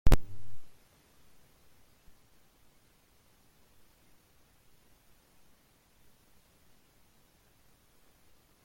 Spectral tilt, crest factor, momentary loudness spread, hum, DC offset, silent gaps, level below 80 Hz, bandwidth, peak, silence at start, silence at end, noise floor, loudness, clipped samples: -6 dB/octave; 24 dB; 7 LU; none; under 0.1%; none; -38 dBFS; 16.5 kHz; -10 dBFS; 0.05 s; 7.95 s; -65 dBFS; -35 LUFS; under 0.1%